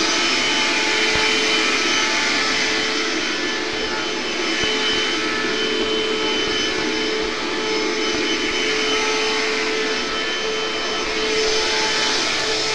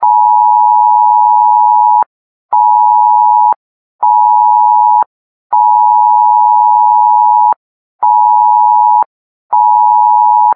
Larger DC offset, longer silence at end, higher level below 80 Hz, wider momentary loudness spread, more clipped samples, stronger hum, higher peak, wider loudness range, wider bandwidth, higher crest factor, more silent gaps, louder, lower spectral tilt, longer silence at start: first, 2% vs under 0.1%; about the same, 0 s vs 0 s; first, -46 dBFS vs -74 dBFS; about the same, 5 LU vs 6 LU; neither; neither; second, -6 dBFS vs 0 dBFS; about the same, 3 LU vs 1 LU; first, 12.5 kHz vs 2 kHz; first, 14 dB vs 8 dB; second, none vs 2.06-2.49 s, 3.56-3.99 s, 5.06-5.50 s, 7.56-7.99 s, 9.06-9.49 s; second, -19 LUFS vs -8 LUFS; second, -1 dB/octave vs -5.5 dB/octave; about the same, 0 s vs 0 s